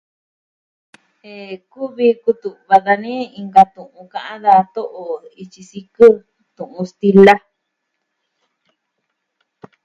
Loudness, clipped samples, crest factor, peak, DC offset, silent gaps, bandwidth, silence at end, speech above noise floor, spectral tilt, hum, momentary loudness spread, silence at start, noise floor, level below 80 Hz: -14 LUFS; 0.5%; 16 dB; 0 dBFS; under 0.1%; none; 7.8 kHz; 2.45 s; 59 dB; -7 dB/octave; none; 23 LU; 1.35 s; -74 dBFS; -60 dBFS